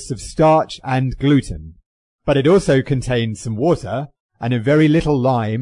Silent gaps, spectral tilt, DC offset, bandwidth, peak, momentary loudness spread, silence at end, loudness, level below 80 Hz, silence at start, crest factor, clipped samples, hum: 1.86-2.18 s, 4.20-4.29 s; -7 dB/octave; under 0.1%; 11 kHz; -4 dBFS; 13 LU; 0 s; -17 LUFS; -38 dBFS; 0 s; 12 dB; under 0.1%; none